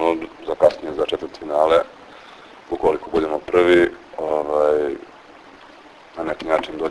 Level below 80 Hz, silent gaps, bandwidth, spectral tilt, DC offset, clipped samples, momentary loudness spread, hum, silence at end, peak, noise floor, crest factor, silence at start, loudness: -52 dBFS; none; 11 kHz; -5.5 dB/octave; under 0.1%; under 0.1%; 13 LU; none; 0 s; -2 dBFS; -45 dBFS; 20 dB; 0 s; -20 LUFS